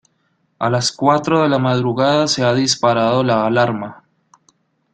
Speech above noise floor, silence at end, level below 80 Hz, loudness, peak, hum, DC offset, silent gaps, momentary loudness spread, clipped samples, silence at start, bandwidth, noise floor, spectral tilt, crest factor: 49 dB; 1 s; -56 dBFS; -16 LUFS; -2 dBFS; none; under 0.1%; none; 5 LU; under 0.1%; 0.6 s; 9.4 kHz; -64 dBFS; -5 dB/octave; 16 dB